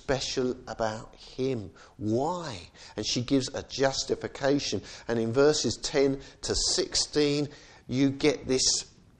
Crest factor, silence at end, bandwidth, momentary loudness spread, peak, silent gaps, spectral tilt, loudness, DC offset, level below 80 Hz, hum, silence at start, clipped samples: 18 dB; 0.3 s; 10 kHz; 12 LU; -10 dBFS; none; -3.5 dB/octave; -28 LUFS; under 0.1%; -50 dBFS; none; 0.1 s; under 0.1%